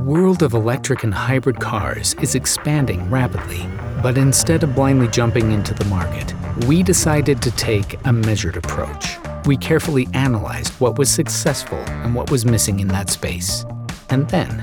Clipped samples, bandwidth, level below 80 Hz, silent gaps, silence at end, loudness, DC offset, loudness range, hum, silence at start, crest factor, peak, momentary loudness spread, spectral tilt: under 0.1%; over 20 kHz; -36 dBFS; none; 0 s; -18 LUFS; under 0.1%; 2 LU; none; 0 s; 16 dB; -2 dBFS; 9 LU; -5 dB/octave